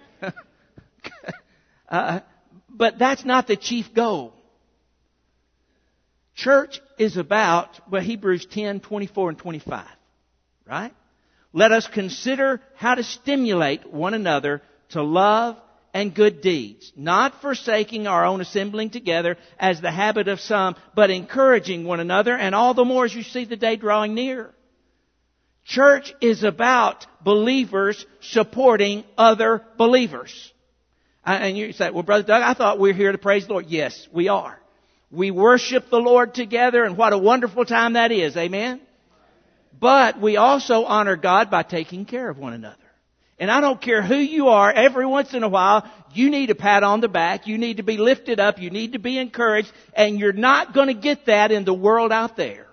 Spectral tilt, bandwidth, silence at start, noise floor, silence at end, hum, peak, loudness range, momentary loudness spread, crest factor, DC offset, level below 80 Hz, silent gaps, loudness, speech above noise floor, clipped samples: -4.5 dB/octave; 6.6 kHz; 0.2 s; -68 dBFS; 0.1 s; none; 0 dBFS; 6 LU; 13 LU; 20 dB; under 0.1%; -66 dBFS; none; -19 LUFS; 49 dB; under 0.1%